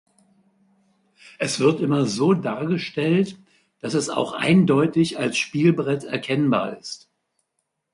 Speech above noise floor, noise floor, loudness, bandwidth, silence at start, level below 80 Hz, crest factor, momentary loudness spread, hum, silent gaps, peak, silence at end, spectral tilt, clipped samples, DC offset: 56 dB; -76 dBFS; -21 LUFS; 11.5 kHz; 1.4 s; -64 dBFS; 18 dB; 10 LU; none; none; -6 dBFS; 1 s; -6 dB/octave; under 0.1%; under 0.1%